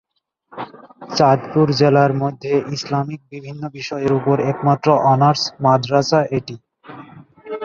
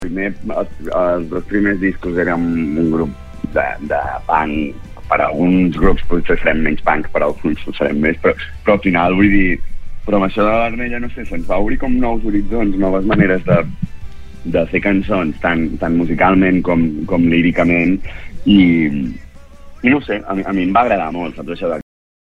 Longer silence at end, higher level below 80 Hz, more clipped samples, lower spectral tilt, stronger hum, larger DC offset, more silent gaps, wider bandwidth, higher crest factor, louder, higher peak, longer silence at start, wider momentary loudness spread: second, 0 s vs 0.55 s; second, -56 dBFS vs -28 dBFS; neither; second, -6.5 dB/octave vs -8.5 dB/octave; neither; neither; neither; first, 7.4 kHz vs 5 kHz; about the same, 16 dB vs 14 dB; about the same, -17 LUFS vs -16 LUFS; about the same, -2 dBFS vs 0 dBFS; first, 0.5 s vs 0 s; first, 19 LU vs 10 LU